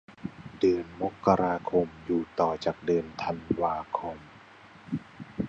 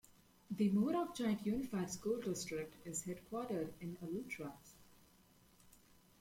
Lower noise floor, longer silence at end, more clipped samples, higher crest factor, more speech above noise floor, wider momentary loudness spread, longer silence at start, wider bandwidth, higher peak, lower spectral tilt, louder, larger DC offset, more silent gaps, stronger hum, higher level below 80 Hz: second, -52 dBFS vs -68 dBFS; second, 0 s vs 0.45 s; neither; first, 22 dB vs 16 dB; second, 24 dB vs 28 dB; first, 15 LU vs 12 LU; about the same, 0.1 s vs 0.1 s; second, 8 kHz vs 16.5 kHz; first, -8 dBFS vs -26 dBFS; first, -7.5 dB/octave vs -5.5 dB/octave; first, -29 LUFS vs -41 LUFS; neither; neither; neither; first, -56 dBFS vs -70 dBFS